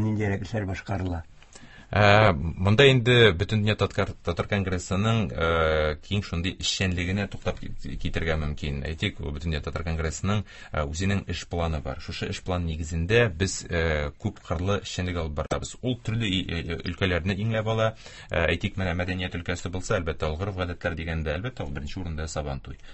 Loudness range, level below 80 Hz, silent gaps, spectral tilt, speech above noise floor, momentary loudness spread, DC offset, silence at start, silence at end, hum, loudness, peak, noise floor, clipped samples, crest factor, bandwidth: 9 LU; -38 dBFS; none; -5.5 dB/octave; 21 dB; 13 LU; under 0.1%; 0 s; 0 s; none; -26 LUFS; -4 dBFS; -47 dBFS; under 0.1%; 22 dB; 8.6 kHz